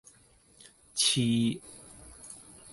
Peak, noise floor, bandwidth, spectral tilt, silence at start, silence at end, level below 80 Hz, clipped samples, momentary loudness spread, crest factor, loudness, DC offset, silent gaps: -12 dBFS; -61 dBFS; 12 kHz; -3.5 dB/octave; 0.95 s; 0 s; -64 dBFS; under 0.1%; 23 LU; 20 dB; -27 LUFS; under 0.1%; none